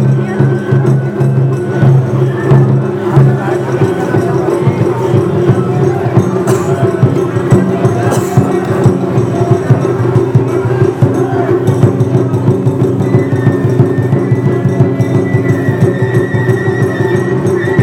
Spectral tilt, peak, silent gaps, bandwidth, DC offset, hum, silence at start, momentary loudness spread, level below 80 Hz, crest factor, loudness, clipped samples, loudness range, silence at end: -8.5 dB/octave; 0 dBFS; none; 12 kHz; under 0.1%; none; 0 s; 3 LU; -40 dBFS; 10 dB; -11 LUFS; 0.4%; 1 LU; 0 s